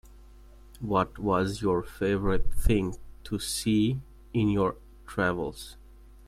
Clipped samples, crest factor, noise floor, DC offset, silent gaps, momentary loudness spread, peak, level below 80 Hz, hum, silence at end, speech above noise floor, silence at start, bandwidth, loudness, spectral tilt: under 0.1%; 20 dB; -51 dBFS; under 0.1%; none; 11 LU; -8 dBFS; -38 dBFS; none; 0.55 s; 24 dB; 0.8 s; 15 kHz; -29 LUFS; -6 dB/octave